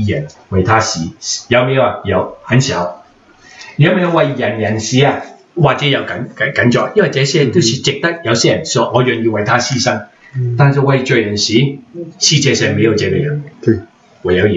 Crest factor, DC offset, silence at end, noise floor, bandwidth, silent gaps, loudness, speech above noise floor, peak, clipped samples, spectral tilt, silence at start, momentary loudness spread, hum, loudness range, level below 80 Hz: 14 dB; under 0.1%; 0 s; -44 dBFS; 8 kHz; none; -13 LUFS; 31 dB; 0 dBFS; under 0.1%; -4.5 dB/octave; 0 s; 9 LU; none; 2 LU; -48 dBFS